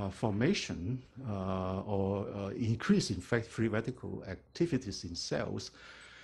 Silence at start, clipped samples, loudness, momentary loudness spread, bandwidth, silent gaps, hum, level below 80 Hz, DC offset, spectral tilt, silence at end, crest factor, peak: 0 s; under 0.1%; -35 LUFS; 12 LU; 11.5 kHz; none; none; -58 dBFS; under 0.1%; -6 dB/octave; 0 s; 20 dB; -16 dBFS